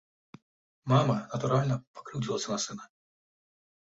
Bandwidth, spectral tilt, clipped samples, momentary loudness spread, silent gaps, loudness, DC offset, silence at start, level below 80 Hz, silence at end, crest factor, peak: 8 kHz; -5.5 dB/octave; under 0.1%; 14 LU; 1.87-1.94 s; -30 LUFS; under 0.1%; 0.85 s; -64 dBFS; 1.1 s; 20 dB; -12 dBFS